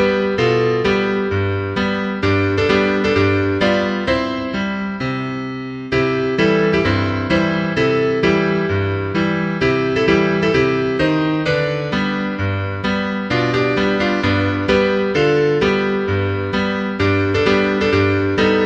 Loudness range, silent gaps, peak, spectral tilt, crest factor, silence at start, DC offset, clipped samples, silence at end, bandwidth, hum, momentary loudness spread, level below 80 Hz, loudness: 2 LU; none; -2 dBFS; -7 dB/octave; 16 dB; 0 s; under 0.1%; under 0.1%; 0 s; 8.6 kHz; none; 5 LU; -40 dBFS; -17 LUFS